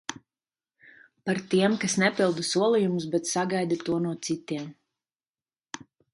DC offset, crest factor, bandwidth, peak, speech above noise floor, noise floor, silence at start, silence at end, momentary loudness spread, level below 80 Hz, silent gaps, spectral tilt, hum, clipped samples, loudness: under 0.1%; 18 dB; 11.5 kHz; -10 dBFS; over 64 dB; under -90 dBFS; 0.1 s; 0.35 s; 18 LU; -70 dBFS; 5.29-5.34 s; -4.5 dB/octave; none; under 0.1%; -26 LUFS